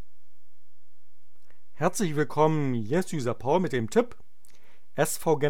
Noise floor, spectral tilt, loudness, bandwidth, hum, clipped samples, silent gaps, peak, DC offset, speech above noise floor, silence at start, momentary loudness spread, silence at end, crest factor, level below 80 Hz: -71 dBFS; -5.5 dB/octave; -27 LUFS; 18 kHz; none; under 0.1%; none; -8 dBFS; 3%; 45 dB; 0 s; 6 LU; 0 s; 20 dB; -64 dBFS